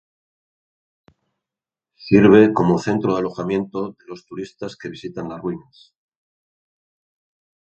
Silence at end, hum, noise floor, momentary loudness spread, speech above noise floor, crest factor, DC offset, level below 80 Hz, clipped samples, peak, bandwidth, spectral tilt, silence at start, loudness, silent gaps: 2.05 s; none; -89 dBFS; 22 LU; 70 dB; 22 dB; under 0.1%; -54 dBFS; under 0.1%; 0 dBFS; 8.2 kHz; -7.5 dB/octave; 2 s; -17 LUFS; none